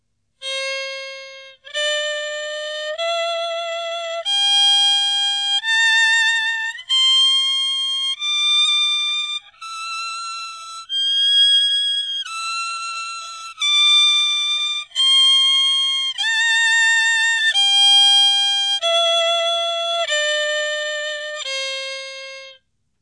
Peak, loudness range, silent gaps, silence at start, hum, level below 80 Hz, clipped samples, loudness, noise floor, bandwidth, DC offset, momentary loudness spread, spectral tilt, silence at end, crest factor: -6 dBFS; 8 LU; none; 0.4 s; none; -76 dBFS; under 0.1%; -15 LUFS; -53 dBFS; 11 kHz; under 0.1%; 15 LU; 5.5 dB/octave; 0.5 s; 14 dB